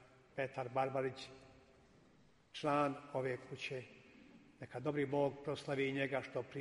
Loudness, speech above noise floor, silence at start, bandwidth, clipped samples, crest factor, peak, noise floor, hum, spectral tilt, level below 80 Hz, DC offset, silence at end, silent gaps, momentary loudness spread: -40 LUFS; 29 dB; 0 s; 11.5 kHz; under 0.1%; 20 dB; -22 dBFS; -69 dBFS; none; -6 dB/octave; -76 dBFS; under 0.1%; 0 s; none; 17 LU